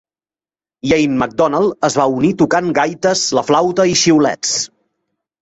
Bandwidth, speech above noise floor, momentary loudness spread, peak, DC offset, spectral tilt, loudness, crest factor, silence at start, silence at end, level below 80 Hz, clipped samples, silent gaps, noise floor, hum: 8.2 kHz; over 76 dB; 5 LU; -2 dBFS; under 0.1%; -4 dB/octave; -14 LUFS; 14 dB; 0.85 s; 0.75 s; -50 dBFS; under 0.1%; none; under -90 dBFS; none